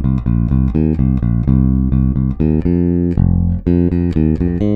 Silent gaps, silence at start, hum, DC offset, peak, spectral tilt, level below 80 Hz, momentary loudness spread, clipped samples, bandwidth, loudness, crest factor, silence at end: none; 0 s; none; under 0.1%; 0 dBFS; -12 dB/octave; -20 dBFS; 2 LU; under 0.1%; 4.8 kHz; -15 LUFS; 14 dB; 0 s